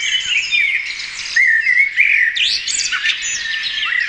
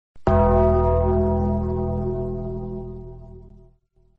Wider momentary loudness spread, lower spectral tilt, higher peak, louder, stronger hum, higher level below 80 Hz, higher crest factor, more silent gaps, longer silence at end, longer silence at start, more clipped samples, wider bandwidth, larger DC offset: second, 7 LU vs 19 LU; second, 3.5 dB/octave vs -11.5 dB/octave; first, 0 dBFS vs -8 dBFS; first, -14 LUFS vs -22 LUFS; neither; second, -54 dBFS vs -30 dBFS; about the same, 16 dB vs 14 dB; neither; second, 0 s vs 0.65 s; second, 0 s vs 0.15 s; neither; first, 10.5 kHz vs 3.8 kHz; second, under 0.1% vs 0.5%